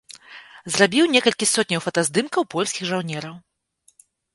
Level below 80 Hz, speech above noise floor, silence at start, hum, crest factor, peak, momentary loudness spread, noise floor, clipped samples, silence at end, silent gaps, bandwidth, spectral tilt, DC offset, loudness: -66 dBFS; 41 dB; 0.1 s; none; 22 dB; -2 dBFS; 22 LU; -62 dBFS; under 0.1%; 0.95 s; none; 12 kHz; -3 dB/octave; under 0.1%; -20 LUFS